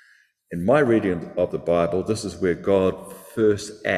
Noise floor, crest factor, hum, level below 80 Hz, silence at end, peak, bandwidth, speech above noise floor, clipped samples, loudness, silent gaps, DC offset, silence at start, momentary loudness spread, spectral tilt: -58 dBFS; 16 dB; none; -48 dBFS; 0 s; -6 dBFS; 14.5 kHz; 36 dB; under 0.1%; -22 LUFS; none; under 0.1%; 0.5 s; 8 LU; -6 dB/octave